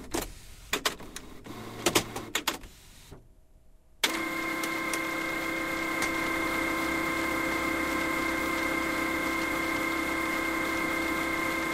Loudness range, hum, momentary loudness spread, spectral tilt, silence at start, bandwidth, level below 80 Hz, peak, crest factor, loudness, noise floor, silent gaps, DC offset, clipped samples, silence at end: 4 LU; none; 7 LU; -2.5 dB/octave; 0 s; 16 kHz; -50 dBFS; -8 dBFS; 24 dB; -29 LUFS; -56 dBFS; none; under 0.1%; under 0.1%; 0 s